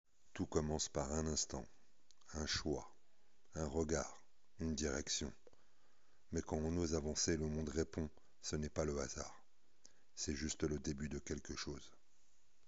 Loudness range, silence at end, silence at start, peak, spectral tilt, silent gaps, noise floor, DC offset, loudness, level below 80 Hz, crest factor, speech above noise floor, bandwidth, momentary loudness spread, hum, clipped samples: 3 LU; 0.8 s; 0.05 s; -22 dBFS; -5 dB/octave; none; -79 dBFS; 0.2%; -42 LUFS; -56 dBFS; 22 dB; 37 dB; 8 kHz; 11 LU; none; under 0.1%